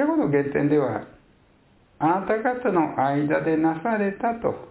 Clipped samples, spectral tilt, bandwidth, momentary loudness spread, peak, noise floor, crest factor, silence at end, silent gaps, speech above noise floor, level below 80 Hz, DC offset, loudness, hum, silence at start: under 0.1%; -11.5 dB/octave; 4 kHz; 4 LU; -8 dBFS; -58 dBFS; 14 dB; 0 s; none; 35 dB; -58 dBFS; under 0.1%; -23 LUFS; none; 0 s